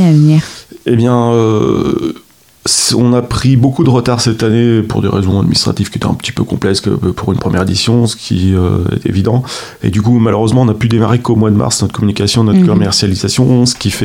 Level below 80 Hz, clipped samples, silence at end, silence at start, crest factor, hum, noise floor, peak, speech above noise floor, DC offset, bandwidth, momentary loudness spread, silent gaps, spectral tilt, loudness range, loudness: -36 dBFS; under 0.1%; 0 s; 0 s; 10 dB; none; -40 dBFS; 0 dBFS; 30 dB; 0.1%; 16 kHz; 6 LU; none; -5.5 dB/octave; 3 LU; -11 LUFS